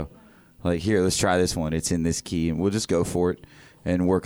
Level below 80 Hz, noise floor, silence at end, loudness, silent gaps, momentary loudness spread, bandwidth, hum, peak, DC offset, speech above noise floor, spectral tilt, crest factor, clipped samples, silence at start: -44 dBFS; -52 dBFS; 0 s; -24 LUFS; none; 8 LU; over 20 kHz; none; -8 dBFS; under 0.1%; 28 dB; -5 dB/octave; 16 dB; under 0.1%; 0 s